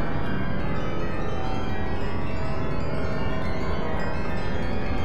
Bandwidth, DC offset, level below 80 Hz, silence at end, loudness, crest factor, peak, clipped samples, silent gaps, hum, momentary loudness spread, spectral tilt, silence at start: 11.5 kHz; 7%; -34 dBFS; 0 s; -29 LUFS; 12 dB; -12 dBFS; under 0.1%; none; none; 1 LU; -7.5 dB/octave; 0 s